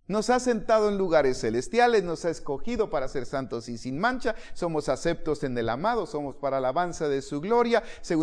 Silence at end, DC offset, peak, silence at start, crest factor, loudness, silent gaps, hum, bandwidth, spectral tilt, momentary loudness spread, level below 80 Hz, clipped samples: 0 s; under 0.1%; -8 dBFS; 0.1 s; 18 dB; -27 LUFS; none; none; 10.5 kHz; -5 dB/octave; 9 LU; -44 dBFS; under 0.1%